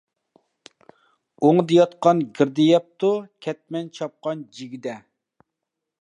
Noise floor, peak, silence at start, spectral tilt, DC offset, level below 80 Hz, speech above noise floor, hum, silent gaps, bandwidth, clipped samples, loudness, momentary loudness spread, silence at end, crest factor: -83 dBFS; -4 dBFS; 1.4 s; -7 dB/octave; under 0.1%; -76 dBFS; 62 dB; none; none; 9.6 kHz; under 0.1%; -21 LUFS; 17 LU; 1.05 s; 20 dB